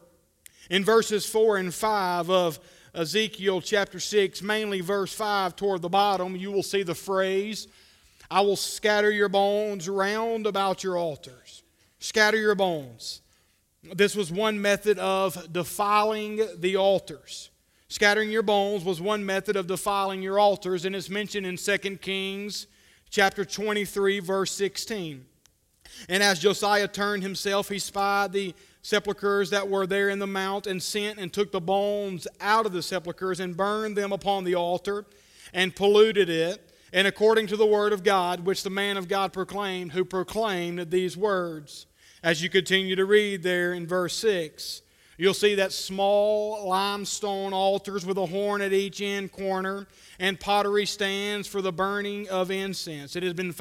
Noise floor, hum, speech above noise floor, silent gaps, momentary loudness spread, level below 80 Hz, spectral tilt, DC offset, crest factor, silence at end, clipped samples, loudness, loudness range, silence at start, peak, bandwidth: -66 dBFS; none; 40 dB; none; 10 LU; -62 dBFS; -3.5 dB/octave; under 0.1%; 20 dB; 0 s; under 0.1%; -26 LUFS; 3 LU; 0.6 s; -6 dBFS; 16 kHz